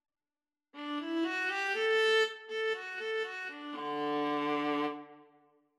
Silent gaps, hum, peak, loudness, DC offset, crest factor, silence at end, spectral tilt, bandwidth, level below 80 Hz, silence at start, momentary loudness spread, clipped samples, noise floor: none; none; -18 dBFS; -33 LUFS; under 0.1%; 16 dB; 0.55 s; -3 dB/octave; 12.5 kHz; under -90 dBFS; 0.75 s; 12 LU; under 0.1%; under -90 dBFS